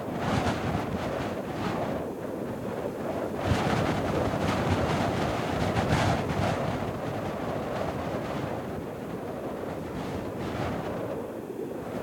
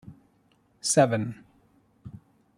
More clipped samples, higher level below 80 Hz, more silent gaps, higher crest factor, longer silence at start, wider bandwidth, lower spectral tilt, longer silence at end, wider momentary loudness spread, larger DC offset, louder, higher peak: neither; first, -48 dBFS vs -66 dBFS; neither; about the same, 18 dB vs 22 dB; about the same, 0 s vs 0.05 s; about the same, 17.5 kHz vs 16 kHz; first, -6.5 dB/octave vs -4.5 dB/octave; second, 0 s vs 0.4 s; second, 8 LU vs 26 LU; neither; second, -30 LUFS vs -25 LUFS; second, -12 dBFS vs -8 dBFS